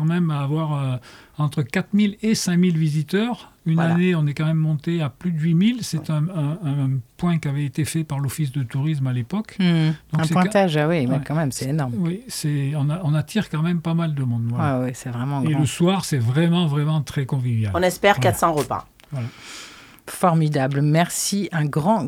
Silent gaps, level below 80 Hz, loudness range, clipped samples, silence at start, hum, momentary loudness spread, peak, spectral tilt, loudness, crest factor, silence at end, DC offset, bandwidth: none; -54 dBFS; 3 LU; under 0.1%; 0 s; none; 8 LU; 0 dBFS; -6 dB/octave; -21 LUFS; 20 dB; 0 s; under 0.1%; 15.5 kHz